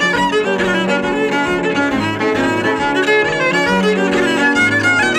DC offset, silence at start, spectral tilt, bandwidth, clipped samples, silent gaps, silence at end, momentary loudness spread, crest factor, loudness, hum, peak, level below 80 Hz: under 0.1%; 0 s; -4.5 dB/octave; 15.5 kHz; under 0.1%; none; 0 s; 4 LU; 12 dB; -14 LUFS; none; -2 dBFS; -44 dBFS